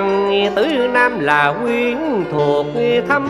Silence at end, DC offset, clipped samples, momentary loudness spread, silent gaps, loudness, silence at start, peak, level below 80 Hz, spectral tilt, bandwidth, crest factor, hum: 0 s; under 0.1%; under 0.1%; 4 LU; none; -16 LUFS; 0 s; 0 dBFS; -50 dBFS; -6 dB/octave; 12.5 kHz; 16 dB; none